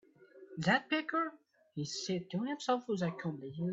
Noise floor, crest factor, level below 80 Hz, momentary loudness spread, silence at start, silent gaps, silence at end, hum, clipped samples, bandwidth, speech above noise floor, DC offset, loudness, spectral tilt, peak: -58 dBFS; 22 dB; -76 dBFS; 10 LU; 0.2 s; none; 0 s; none; under 0.1%; 8 kHz; 23 dB; under 0.1%; -36 LUFS; -5 dB/octave; -16 dBFS